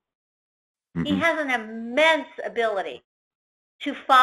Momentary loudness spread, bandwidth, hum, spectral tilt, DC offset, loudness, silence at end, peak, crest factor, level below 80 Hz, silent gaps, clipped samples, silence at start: 15 LU; 13.5 kHz; none; -4.5 dB/octave; under 0.1%; -24 LUFS; 0 s; -4 dBFS; 22 dB; -62 dBFS; 3.04-3.79 s; under 0.1%; 0.95 s